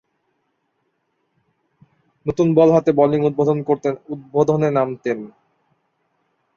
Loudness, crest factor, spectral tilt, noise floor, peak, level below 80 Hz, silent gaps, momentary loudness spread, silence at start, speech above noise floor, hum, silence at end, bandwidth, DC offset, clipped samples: -18 LUFS; 18 dB; -8.5 dB/octave; -70 dBFS; -2 dBFS; -56 dBFS; none; 14 LU; 2.25 s; 53 dB; none; 1.3 s; 7 kHz; under 0.1%; under 0.1%